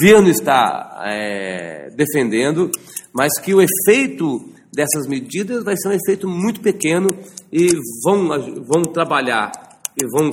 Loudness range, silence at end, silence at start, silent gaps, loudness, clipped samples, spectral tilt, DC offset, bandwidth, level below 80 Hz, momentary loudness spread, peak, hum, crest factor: 2 LU; 0 s; 0 s; none; -17 LUFS; under 0.1%; -4.5 dB/octave; under 0.1%; 17 kHz; -56 dBFS; 12 LU; 0 dBFS; none; 16 dB